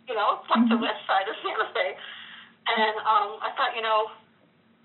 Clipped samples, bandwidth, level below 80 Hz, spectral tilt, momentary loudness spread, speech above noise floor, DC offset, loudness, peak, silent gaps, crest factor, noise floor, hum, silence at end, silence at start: under 0.1%; 4.2 kHz; -90 dBFS; -1 dB/octave; 12 LU; 36 dB; under 0.1%; -25 LUFS; -10 dBFS; none; 18 dB; -61 dBFS; none; 0.7 s; 0.05 s